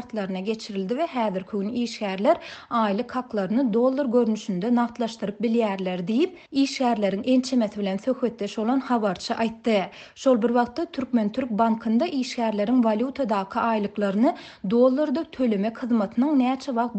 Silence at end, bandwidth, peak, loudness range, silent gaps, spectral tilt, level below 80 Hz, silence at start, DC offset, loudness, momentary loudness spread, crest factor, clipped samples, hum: 0 s; 8.6 kHz; -8 dBFS; 2 LU; none; -6 dB/octave; -64 dBFS; 0 s; under 0.1%; -24 LUFS; 7 LU; 16 dB; under 0.1%; none